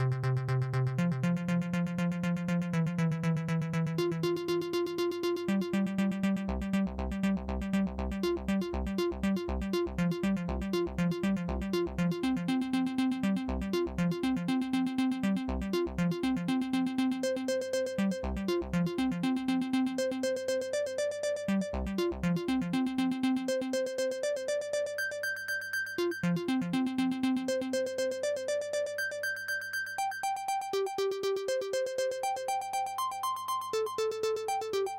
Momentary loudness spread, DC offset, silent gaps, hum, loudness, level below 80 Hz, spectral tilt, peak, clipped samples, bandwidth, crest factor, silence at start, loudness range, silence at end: 3 LU; under 0.1%; none; none; -32 LUFS; -48 dBFS; -6 dB/octave; -20 dBFS; under 0.1%; 16.5 kHz; 12 dB; 0 s; 2 LU; 0 s